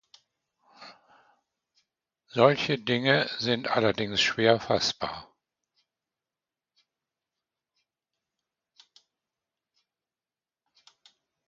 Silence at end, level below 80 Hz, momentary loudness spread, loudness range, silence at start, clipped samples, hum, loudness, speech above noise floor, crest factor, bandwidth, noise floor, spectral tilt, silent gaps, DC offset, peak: 6.25 s; -66 dBFS; 12 LU; 8 LU; 0.8 s; under 0.1%; none; -25 LUFS; over 65 dB; 28 dB; 7.6 kHz; under -90 dBFS; -4.5 dB/octave; none; under 0.1%; -4 dBFS